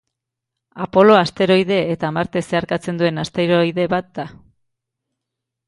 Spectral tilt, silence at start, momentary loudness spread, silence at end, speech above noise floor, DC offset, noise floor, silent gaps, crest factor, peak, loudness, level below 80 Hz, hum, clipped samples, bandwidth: -6.5 dB/octave; 0.75 s; 13 LU; 1.35 s; 64 dB; under 0.1%; -81 dBFS; none; 18 dB; 0 dBFS; -17 LUFS; -54 dBFS; none; under 0.1%; 11.5 kHz